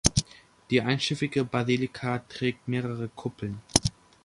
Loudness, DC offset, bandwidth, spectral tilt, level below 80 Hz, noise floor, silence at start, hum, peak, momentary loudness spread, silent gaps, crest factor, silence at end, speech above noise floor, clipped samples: -28 LUFS; under 0.1%; 11.5 kHz; -4 dB/octave; -46 dBFS; -49 dBFS; 0.05 s; none; 0 dBFS; 9 LU; none; 28 dB; 0.35 s; 21 dB; under 0.1%